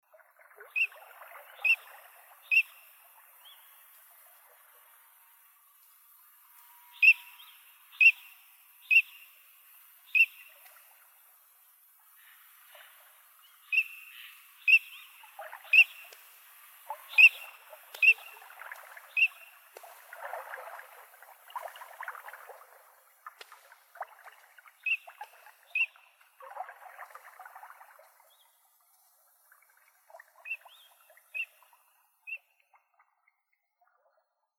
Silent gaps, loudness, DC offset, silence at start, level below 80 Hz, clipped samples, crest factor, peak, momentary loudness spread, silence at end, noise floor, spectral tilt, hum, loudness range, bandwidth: none; -25 LUFS; under 0.1%; 0.75 s; under -90 dBFS; under 0.1%; 24 dB; -8 dBFS; 29 LU; 2.2 s; -80 dBFS; 6.5 dB/octave; none; 21 LU; 18 kHz